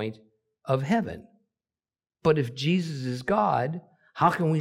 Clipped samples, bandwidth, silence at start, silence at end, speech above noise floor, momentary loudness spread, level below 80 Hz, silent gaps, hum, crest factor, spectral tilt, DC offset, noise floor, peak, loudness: under 0.1%; 13 kHz; 0 s; 0 s; over 65 dB; 15 LU; -62 dBFS; none; none; 20 dB; -7 dB/octave; under 0.1%; under -90 dBFS; -8 dBFS; -26 LUFS